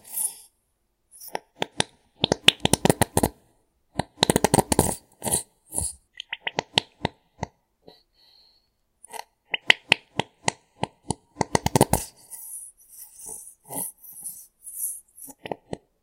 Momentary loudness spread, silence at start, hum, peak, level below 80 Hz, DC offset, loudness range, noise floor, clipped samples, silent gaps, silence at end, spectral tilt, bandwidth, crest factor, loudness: 20 LU; 0.05 s; none; 0 dBFS; -48 dBFS; under 0.1%; 10 LU; -72 dBFS; under 0.1%; none; 0.25 s; -3 dB/octave; 16.5 kHz; 28 dB; -25 LUFS